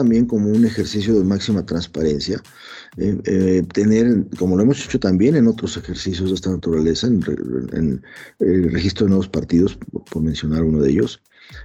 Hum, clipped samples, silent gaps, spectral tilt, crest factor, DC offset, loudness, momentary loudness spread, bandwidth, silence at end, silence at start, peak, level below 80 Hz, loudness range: none; under 0.1%; none; -7 dB/octave; 12 dB; under 0.1%; -19 LUFS; 9 LU; 9 kHz; 0 s; 0 s; -6 dBFS; -40 dBFS; 3 LU